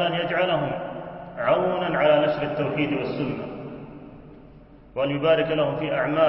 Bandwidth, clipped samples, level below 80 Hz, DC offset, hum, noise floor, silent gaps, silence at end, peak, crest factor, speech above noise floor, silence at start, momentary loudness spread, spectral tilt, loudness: 5.8 kHz; under 0.1%; -54 dBFS; under 0.1%; none; -48 dBFS; none; 0 s; -8 dBFS; 16 dB; 25 dB; 0 s; 17 LU; -10.5 dB/octave; -24 LUFS